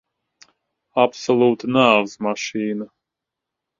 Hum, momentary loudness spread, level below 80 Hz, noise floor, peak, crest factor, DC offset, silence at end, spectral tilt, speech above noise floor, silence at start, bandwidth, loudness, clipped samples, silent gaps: none; 11 LU; -64 dBFS; -84 dBFS; 0 dBFS; 22 dB; under 0.1%; 0.95 s; -5 dB/octave; 65 dB; 0.95 s; 7.6 kHz; -19 LUFS; under 0.1%; none